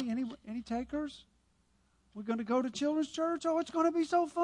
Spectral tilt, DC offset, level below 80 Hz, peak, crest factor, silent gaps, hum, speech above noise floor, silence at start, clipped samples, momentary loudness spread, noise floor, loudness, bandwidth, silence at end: -5 dB/octave; under 0.1%; -66 dBFS; -18 dBFS; 16 dB; none; none; 39 dB; 0 s; under 0.1%; 13 LU; -72 dBFS; -34 LUFS; 11 kHz; 0 s